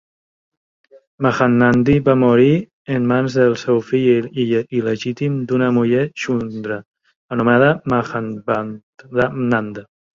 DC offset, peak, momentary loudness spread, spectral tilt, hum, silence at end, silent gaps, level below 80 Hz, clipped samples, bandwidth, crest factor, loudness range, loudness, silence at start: under 0.1%; -2 dBFS; 11 LU; -7.5 dB/octave; none; 0.35 s; 2.73-2.85 s, 6.85-6.92 s, 7.16-7.28 s, 8.83-8.93 s; -50 dBFS; under 0.1%; 7.4 kHz; 16 dB; 4 LU; -17 LUFS; 1.2 s